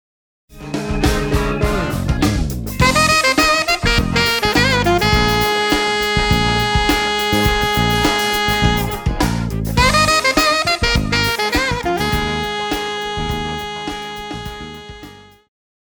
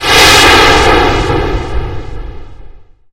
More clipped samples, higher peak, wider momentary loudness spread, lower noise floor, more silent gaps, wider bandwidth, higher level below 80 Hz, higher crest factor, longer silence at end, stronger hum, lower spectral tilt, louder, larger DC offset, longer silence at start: second, under 0.1% vs 2%; about the same, 0 dBFS vs 0 dBFS; second, 13 LU vs 22 LU; first, -39 dBFS vs -32 dBFS; neither; about the same, over 20 kHz vs over 20 kHz; second, -26 dBFS vs -20 dBFS; first, 16 dB vs 10 dB; first, 0.7 s vs 0.35 s; neither; about the same, -4 dB/octave vs -3 dB/octave; second, -16 LUFS vs -6 LUFS; neither; first, 0.5 s vs 0 s